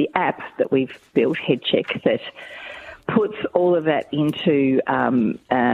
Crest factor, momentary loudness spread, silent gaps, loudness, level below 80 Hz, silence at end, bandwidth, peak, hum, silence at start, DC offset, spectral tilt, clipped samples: 18 dB; 12 LU; none; -21 LUFS; -60 dBFS; 0 s; 11 kHz; -2 dBFS; none; 0 s; under 0.1%; -7.5 dB/octave; under 0.1%